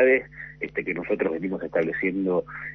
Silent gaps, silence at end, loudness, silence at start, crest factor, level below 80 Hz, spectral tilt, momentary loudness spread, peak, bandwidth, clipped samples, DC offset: none; 0 s; -26 LUFS; 0 s; 16 dB; -56 dBFS; -9 dB/octave; 7 LU; -8 dBFS; 5.8 kHz; under 0.1%; under 0.1%